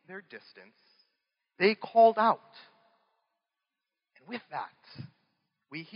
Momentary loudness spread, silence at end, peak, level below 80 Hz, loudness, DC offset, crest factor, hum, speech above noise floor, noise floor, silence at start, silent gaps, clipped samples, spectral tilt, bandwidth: 26 LU; 0.15 s; -10 dBFS; -88 dBFS; -27 LUFS; under 0.1%; 22 dB; none; 59 dB; -88 dBFS; 0.1 s; none; under 0.1%; -3 dB/octave; 5.4 kHz